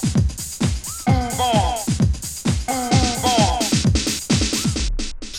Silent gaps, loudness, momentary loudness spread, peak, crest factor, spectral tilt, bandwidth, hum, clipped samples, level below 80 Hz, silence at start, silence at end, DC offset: none; -20 LUFS; 6 LU; -4 dBFS; 16 dB; -4.5 dB/octave; 16.5 kHz; none; under 0.1%; -28 dBFS; 0 s; 0 s; under 0.1%